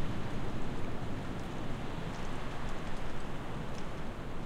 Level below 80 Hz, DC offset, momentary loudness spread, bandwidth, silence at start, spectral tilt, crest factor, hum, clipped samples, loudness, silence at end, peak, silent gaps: -40 dBFS; under 0.1%; 3 LU; 9.6 kHz; 0 s; -6 dB/octave; 12 dB; none; under 0.1%; -41 LUFS; 0 s; -22 dBFS; none